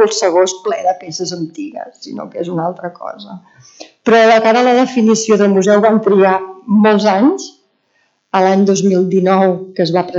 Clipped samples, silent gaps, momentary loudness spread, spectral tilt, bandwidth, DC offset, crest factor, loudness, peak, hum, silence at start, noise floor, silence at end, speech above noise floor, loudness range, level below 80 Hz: under 0.1%; none; 16 LU; -5 dB/octave; 8 kHz; under 0.1%; 12 dB; -12 LUFS; 0 dBFS; none; 0 s; -61 dBFS; 0 s; 48 dB; 9 LU; -66 dBFS